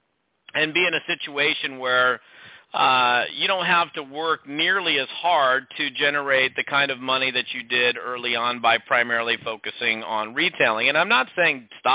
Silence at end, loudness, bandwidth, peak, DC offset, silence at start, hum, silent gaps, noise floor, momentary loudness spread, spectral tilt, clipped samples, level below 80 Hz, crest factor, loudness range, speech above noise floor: 0 s; -21 LUFS; 4 kHz; -6 dBFS; under 0.1%; 0.55 s; none; none; -54 dBFS; 7 LU; -6.5 dB/octave; under 0.1%; -70 dBFS; 16 dB; 1 LU; 31 dB